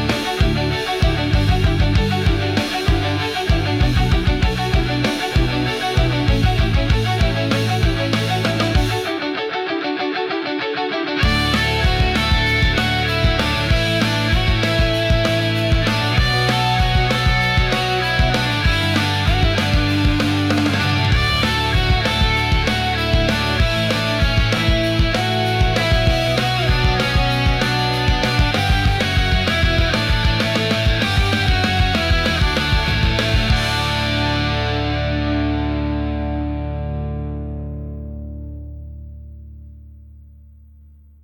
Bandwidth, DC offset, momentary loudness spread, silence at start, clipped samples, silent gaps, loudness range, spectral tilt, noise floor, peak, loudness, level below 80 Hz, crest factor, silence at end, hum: 16 kHz; under 0.1%; 5 LU; 0 s; under 0.1%; none; 5 LU; -5.5 dB/octave; -45 dBFS; -6 dBFS; -18 LUFS; -24 dBFS; 12 dB; 1.05 s; none